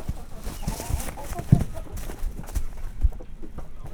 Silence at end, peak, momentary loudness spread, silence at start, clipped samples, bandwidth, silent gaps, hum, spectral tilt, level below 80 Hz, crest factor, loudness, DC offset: 0 s; -2 dBFS; 19 LU; 0 s; under 0.1%; 20 kHz; none; none; -6.5 dB/octave; -30 dBFS; 24 dB; -30 LUFS; under 0.1%